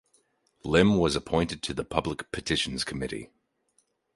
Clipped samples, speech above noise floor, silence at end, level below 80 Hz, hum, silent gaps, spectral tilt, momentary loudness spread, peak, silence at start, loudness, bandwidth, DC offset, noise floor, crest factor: under 0.1%; 44 dB; 0.9 s; -48 dBFS; none; none; -5 dB/octave; 12 LU; -4 dBFS; 0.65 s; -27 LUFS; 11.5 kHz; under 0.1%; -71 dBFS; 24 dB